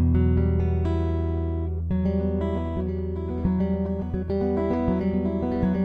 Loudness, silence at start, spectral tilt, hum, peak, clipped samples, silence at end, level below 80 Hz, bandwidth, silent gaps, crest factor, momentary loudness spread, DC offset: -25 LUFS; 0 s; -11 dB/octave; none; -10 dBFS; under 0.1%; 0 s; -32 dBFS; 4.8 kHz; none; 14 dB; 6 LU; under 0.1%